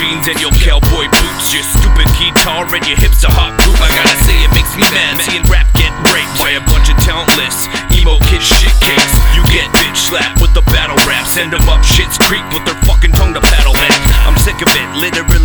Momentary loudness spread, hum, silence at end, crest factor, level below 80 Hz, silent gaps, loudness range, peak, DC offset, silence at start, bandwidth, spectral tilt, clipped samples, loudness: 4 LU; none; 0 s; 8 dB; -10 dBFS; none; 1 LU; 0 dBFS; under 0.1%; 0 s; over 20 kHz; -3.5 dB/octave; under 0.1%; -10 LUFS